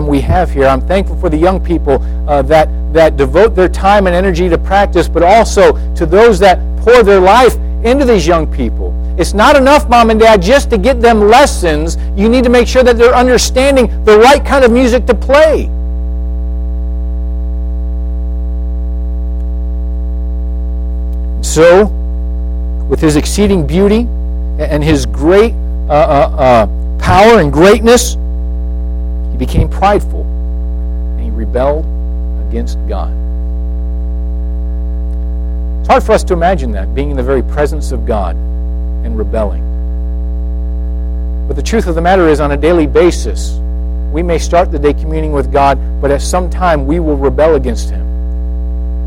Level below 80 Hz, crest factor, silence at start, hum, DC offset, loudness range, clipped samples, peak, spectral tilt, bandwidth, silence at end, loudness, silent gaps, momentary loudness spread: -16 dBFS; 10 dB; 0 s; none; under 0.1%; 10 LU; 0.1%; 0 dBFS; -6 dB/octave; 15.5 kHz; 0 s; -11 LUFS; none; 12 LU